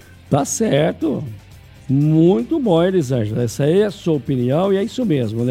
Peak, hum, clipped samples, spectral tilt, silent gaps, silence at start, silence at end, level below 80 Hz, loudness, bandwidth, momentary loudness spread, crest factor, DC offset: -2 dBFS; none; under 0.1%; -6.5 dB/octave; none; 0.3 s; 0 s; -48 dBFS; -18 LUFS; 15.5 kHz; 7 LU; 16 dB; under 0.1%